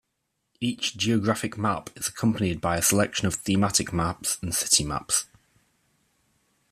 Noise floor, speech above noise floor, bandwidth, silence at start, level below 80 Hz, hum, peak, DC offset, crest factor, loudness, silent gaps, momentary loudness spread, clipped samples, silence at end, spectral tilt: -78 dBFS; 52 dB; 15 kHz; 0.6 s; -52 dBFS; none; -4 dBFS; under 0.1%; 22 dB; -25 LUFS; none; 7 LU; under 0.1%; 1.5 s; -3.5 dB/octave